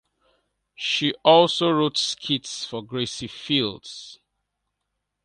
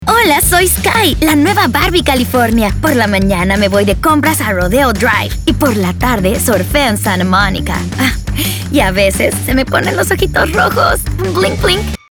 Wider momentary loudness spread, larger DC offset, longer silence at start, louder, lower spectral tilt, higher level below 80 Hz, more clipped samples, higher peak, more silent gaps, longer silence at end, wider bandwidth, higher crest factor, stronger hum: first, 19 LU vs 5 LU; neither; first, 0.8 s vs 0 s; second, -22 LUFS vs -11 LUFS; about the same, -4 dB/octave vs -4.5 dB/octave; second, -64 dBFS vs -22 dBFS; neither; about the same, 0 dBFS vs 0 dBFS; neither; first, 1.1 s vs 0.15 s; second, 11 kHz vs over 20 kHz; first, 24 dB vs 12 dB; neither